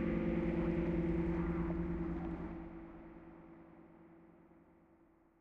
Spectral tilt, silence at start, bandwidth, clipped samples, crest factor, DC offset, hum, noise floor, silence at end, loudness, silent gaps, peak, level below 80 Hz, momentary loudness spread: -10 dB/octave; 0 s; 4.5 kHz; under 0.1%; 16 dB; under 0.1%; none; -68 dBFS; 1.15 s; -38 LUFS; none; -24 dBFS; -48 dBFS; 22 LU